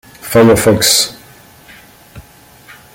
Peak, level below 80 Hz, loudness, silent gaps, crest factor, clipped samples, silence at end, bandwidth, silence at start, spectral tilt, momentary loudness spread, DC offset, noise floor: 0 dBFS; -42 dBFS; -10 LUFS; none; 14 dB; under 0.1%; 0.75 s; 17 kHz; 0.25 s; -3.5 dB/octave; 6 LU; under 0.1%; -41 dBFS